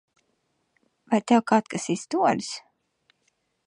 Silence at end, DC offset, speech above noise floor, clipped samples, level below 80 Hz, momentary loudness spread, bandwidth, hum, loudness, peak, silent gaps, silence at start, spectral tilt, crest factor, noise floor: 1.05 s; under 0.1%; 50 dB; under 0.1%; -74 dBFS; 11 LU; 11 kHz; none; -24 LUFS; -6 dBFS; none; 1.1 s; -5 dB/octave; 22 dB; -73 dBFS